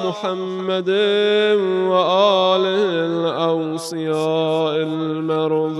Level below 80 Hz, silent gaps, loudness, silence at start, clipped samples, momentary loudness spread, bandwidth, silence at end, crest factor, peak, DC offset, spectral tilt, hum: -72 dBFS; none; -18 LUFS; 0 s; under 0.1%; 8 LU; 12.5 kHz; 0 s; 16 dB; -2 dBFS; under 0.1%; -5.5 dB/octave; none